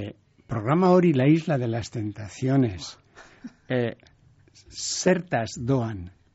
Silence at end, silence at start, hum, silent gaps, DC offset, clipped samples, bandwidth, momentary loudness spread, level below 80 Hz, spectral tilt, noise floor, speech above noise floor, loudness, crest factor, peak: 0.25 s; 0 s; none; none; under 0.1%; under 0.1%; 8 kHz; 20 LU; -56 dBFS; -6.5 dB/octave; -45 dBFS; 22 dB; -24 LUFS; 18 dB; -8 dBFS